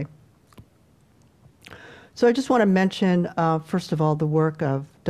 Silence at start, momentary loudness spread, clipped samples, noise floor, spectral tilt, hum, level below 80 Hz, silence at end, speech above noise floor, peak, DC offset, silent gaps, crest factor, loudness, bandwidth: 0 s; 8 LU; under 0.1%; -58 dBFS; -7 dB/octave; none; -60 dBFS; 0 s; 37 dB; -8 dBFS; under 0.1%; none; 16 dB; -22 LUFS; 12.5 kHz